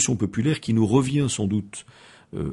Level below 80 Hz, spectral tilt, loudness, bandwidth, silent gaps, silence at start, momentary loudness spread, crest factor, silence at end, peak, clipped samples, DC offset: -50 dBFS; -5.5 dB/octave; -23 LUFS; 11.5 kHz; none; 0 s; 18 LU; 16 dB; 0 s; -6 dBFS; under 0.1%; under 0.1%